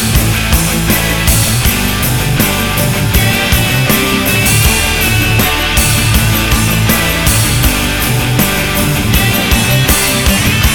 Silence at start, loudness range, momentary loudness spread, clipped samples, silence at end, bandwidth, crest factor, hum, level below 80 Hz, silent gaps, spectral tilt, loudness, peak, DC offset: 0 s; 1 LU; 3 LU; 0.1%; 0 s; 19.5 kHz; 10 dB; none; -18 dBFS; none; -3.5 dB/octave; -10 LUFS; 0 dBFS; under 0.1%